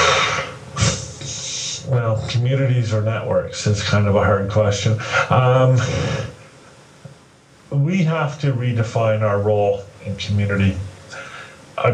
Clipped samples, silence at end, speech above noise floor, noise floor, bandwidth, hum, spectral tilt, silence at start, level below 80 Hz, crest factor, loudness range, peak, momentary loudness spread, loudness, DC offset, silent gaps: under 0.1%; 0 s; 31 dB; -49 dBFS; 9.6 kHz; none; -5.5 dB/octave; 0 s; -44 dBFS; 18 dB; 4 LU; -2 dBFS; 13 LU; -19 LUFS; under 0.1%; none